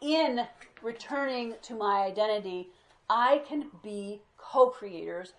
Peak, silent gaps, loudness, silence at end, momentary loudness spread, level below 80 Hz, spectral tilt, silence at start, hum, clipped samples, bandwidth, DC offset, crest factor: -10 dBFS; none; -30 LUFS; 0.1 s; 15 LU; -74 dBFS; -4.5 dB/octave; 0 s; none; under 0.1%; 10.5 kHz; under 0.1%; 20 dB